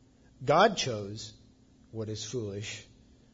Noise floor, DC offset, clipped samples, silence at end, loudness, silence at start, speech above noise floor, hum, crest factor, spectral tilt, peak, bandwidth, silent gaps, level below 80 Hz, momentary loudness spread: -60 dBFS; under 0.1%; under 0.1%; 0.5 s; -30 LUFS; 0.4 s; 30 dB; none; 24 dB; -4 dB/octave; -10 dBFS; 7.8 kHz; none; -62 dBFS; 20 LU